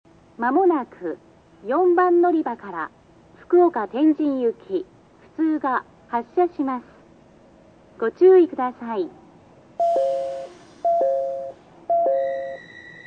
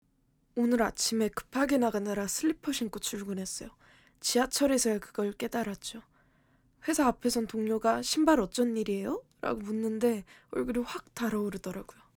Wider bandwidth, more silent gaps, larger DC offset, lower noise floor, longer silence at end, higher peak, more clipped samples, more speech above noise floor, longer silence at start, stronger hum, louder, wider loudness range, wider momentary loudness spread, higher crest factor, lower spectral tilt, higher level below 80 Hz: second, 5.6 kHz vs over 20 kHz; neither; neither; second, -51 dBFS vs -70 dBFS; second, 0.05 s vs 0.35 s; first, -6 dBFS vs -12 dBFS; neither; second, 31 dB vs 40 dB; second, 0.4 s vs 0.55 s; neither; first, -22 LUFS vs -31 LUFS; about the same, 5 LU vs 3 LU; first, 17 LU vs 12 LU; about the same, 16 dB vs 20 dB; first, -7 dB/octave vs -3.5 dB/octave; second, -66 dBFS vs -58 dBFS